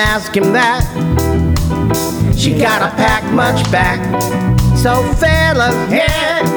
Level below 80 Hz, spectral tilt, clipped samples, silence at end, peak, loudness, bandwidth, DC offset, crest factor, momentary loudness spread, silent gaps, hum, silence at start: -22 dBFS; -5.5 dB/octave; under 0.1%; 0 s; 0 dBFS; -13 LUFS; over 20 kHz; under 0.1%; 12 dB; 4 LU; none; none; 0 s